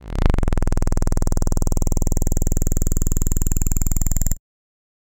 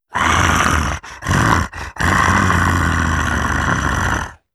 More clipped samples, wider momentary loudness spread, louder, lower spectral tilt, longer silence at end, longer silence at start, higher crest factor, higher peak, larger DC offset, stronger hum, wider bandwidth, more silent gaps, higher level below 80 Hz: neither; second, 1 LU vs 7 LU; second, -23 LUFS vs -16 LUFS; about the same, -5.5 dB/octave vs -4.5 dB/octave; first, 0.75 s vs 0.2 s; about the same, 0.05 s vs 0.1 s; about the same, 10 dB vs 14 dB; second, -8 dBFS vs -4 dBFS; neither; first, 60 Hz at -25 dBFS vs none; first, 17 kHz vs 14 kHz; neither; first, -20 dBFS vs -26 dBFS